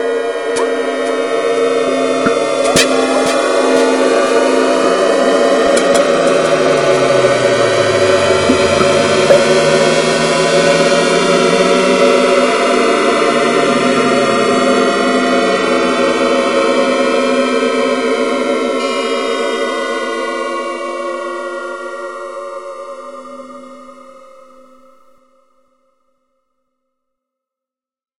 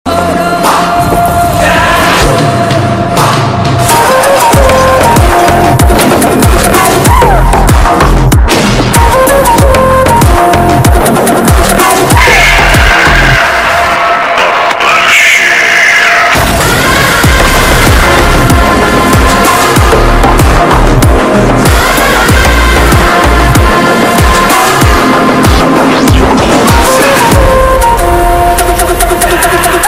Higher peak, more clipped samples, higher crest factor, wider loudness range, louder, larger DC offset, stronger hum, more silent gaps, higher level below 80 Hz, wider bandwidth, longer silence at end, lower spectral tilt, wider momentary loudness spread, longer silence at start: about the same, 0 dBFS vs 0 dBFS; second, under 0.1% vs 3%; first, 14 dB vs 4 dB; first, 12 LU vs 2 LU; second, -12 LUFS vs -5 LUFS; first, 0.4% vs under 0.1%; neither; neither; second, -52 dBFS vs -12 dBFS; second, 15.5 kHz vs over 20 kHz; first, 4 s vs 0 s; about the same, -3.5 dB/octave vs -4.5 dB/octave; first, 11 LU vs 4 LU; about the same, 0 s vs 0.05 s